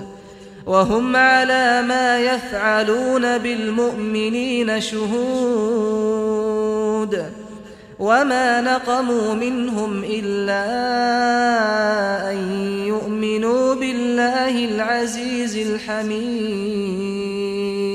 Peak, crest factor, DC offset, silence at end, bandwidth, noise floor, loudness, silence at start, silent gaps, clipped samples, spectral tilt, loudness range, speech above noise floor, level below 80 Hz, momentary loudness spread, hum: -2 dBFS; 16 dB; under 0.1%; 0 s; 14 kHz; -40 dBFS; -19 LUFS; 0 s; none; under 0.1%; -4.5 dB/octave; 4 LU; 21 dB; -54 dBFS; 7 LU; none